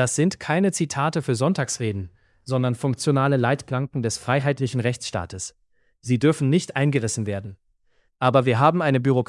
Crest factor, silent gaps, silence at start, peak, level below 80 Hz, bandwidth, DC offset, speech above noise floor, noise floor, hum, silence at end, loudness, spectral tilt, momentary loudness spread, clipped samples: 20 dB; none; 0 s; -4 dBFS; -60 dBFS; 12 kHz; under 0.1%; 43 dB; -64 dBFS; none; 0.05 s; -22 LUFS; -5.5 dB/octave; 11 LU; under 0.1%